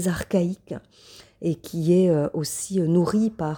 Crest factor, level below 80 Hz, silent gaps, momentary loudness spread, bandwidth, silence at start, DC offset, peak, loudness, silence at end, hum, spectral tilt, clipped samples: 14 dB; -54 dBFS; none; 12 LU; 19.5 kHz; 0 s; under 0.1%; -8 dBFS; -23 LUFS; 0 s; none; -6.5 dB/octave; under 0.1%